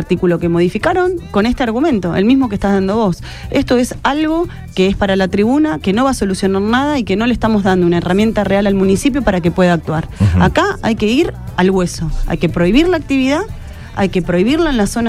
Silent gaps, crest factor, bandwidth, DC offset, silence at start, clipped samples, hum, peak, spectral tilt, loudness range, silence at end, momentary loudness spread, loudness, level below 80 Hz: none; 12 dB; 14.5 kHz; under 0.1%; 0 s; under 0.1%; none; 0 dBFS; -6.5 dB/octave; 2 LU; 0 s; 6 LU; -14 LUFS; -28 dBFS